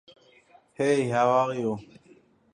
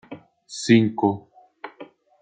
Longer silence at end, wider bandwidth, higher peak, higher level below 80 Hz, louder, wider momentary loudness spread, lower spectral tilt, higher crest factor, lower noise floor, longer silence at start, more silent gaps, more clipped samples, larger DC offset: first, 0.75 s vs 0.35 s; first, 11 kHz vs 9.4 kHz; second, -10 dBFS vs -4 dBFS; about the same, -68 dBFS vs -66 dBFS; second, -25 LUFS vs -20 LUFS; second, 9 LU vs 25 LU; about the same, -6 dB/octave vs -6 dB/octave; about the same, 18 dB vs 20 dB; first, -58 dBFS vs -46 dBFS; first, 0.8 s vs 0.1 s; neither; neither; neither